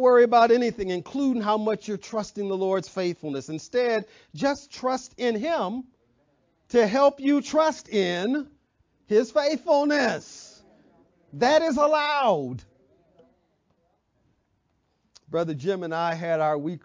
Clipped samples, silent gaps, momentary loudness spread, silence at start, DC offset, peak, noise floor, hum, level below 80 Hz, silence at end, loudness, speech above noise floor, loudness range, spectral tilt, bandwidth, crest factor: under 0.1%; none; 11 LU; 0 s; under 0.1%; -6 dBFS; -71 dBFS; none; -64 dBFS; 0.05 s; -24 LUFS; 47 dB; 7 LU; -5 dB/octave; 7.6 kHz; 18 dB